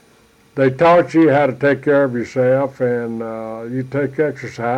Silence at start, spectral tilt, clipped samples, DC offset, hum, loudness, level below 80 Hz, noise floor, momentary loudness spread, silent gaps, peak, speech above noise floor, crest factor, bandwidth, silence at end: 0.55 s; -8 dB/octave; under 0.1%; under 0.1%; none; -17 LUFS; -56 dBFS; -51 dBFS; 13 LU; none; -4 dBFS; 35 dB; 12 dB; 9.8 kHz; 0 s